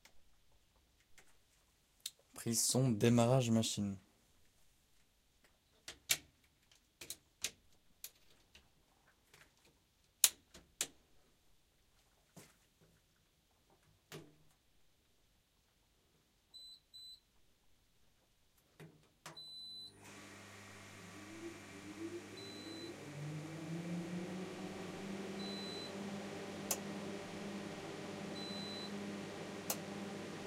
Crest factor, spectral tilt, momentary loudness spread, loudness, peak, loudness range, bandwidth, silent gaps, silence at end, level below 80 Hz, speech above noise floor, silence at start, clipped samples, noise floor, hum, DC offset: 36 dB; -4 dB/octave; 23 LU; -40 LUFS; -8 dBFS; 24 LU; 16 kHz; none; 0 s; -76 dBFS; 42 dB; 0.15 s; under 0.1%; -76 dBFS; none; under 0.1%